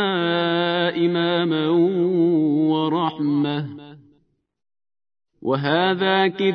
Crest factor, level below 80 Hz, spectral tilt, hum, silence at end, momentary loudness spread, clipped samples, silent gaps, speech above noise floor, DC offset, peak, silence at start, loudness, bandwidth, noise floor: 16 dB; -72 dBFS; -8.5 dB/octave; none; 0 s; 6 LU; under 0.1%; none; 45 dB; under 0.1%; -6 dBFS; 0 s; -20 LUFS; 5.4 kHz; -64 dBFS